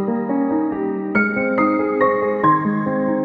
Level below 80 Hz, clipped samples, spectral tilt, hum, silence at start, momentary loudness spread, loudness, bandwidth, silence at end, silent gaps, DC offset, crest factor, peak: -58 dBFS; under 0.1%; -10 dB/octave; none; 0 s; 4 LU; -18 LUFS; 4.8 kHz; 0 s; none; under 0.1%; 14 dB; -4 dBFS